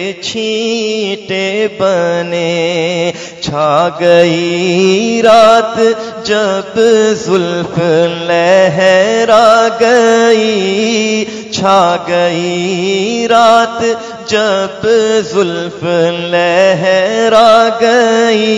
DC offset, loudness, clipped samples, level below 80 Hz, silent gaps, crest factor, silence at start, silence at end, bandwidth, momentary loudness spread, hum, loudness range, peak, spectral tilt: under 0.1%; -10 LUFS; 0.9%; -52 dBFS; none; 10 dB; 0 s; 0 s; 12 kHz; 8 LU; none; 3 LU; 0 dBFS; -4.5 dB/octave